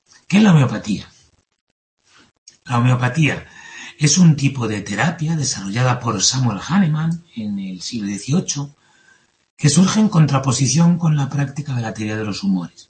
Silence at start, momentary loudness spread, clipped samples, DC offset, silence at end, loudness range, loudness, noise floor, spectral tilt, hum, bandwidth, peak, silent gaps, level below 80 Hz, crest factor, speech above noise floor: 0.3 s; 13 LU; under 0.1%; under 0.1%; 0.1 s; 5 LU; -18 LUFS; -55 dBFS; -5 dB/octave; none; 8.8 kHz; -2 dBFS; 1.61-1.97 s, 2.38-2.46 s, 9.50-9.57 s; -52 dBFS; 16 dB; 38 dB